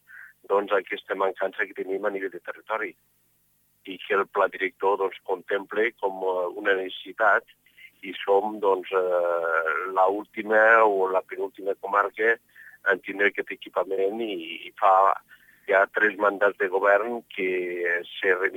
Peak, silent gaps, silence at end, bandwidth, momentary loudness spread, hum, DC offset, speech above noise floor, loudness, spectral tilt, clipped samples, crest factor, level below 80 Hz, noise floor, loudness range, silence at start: -6 dBFS; none; 0 s; 17 kHz; 11 LU; 50 Hz at -75 dBFS; under 0.1%; 42 dB; -25 LUFS; -5 dB/octave; under 0.1%; 20 dB; -80 dBFS; -67 dBFS; 6 LU; 0.1 s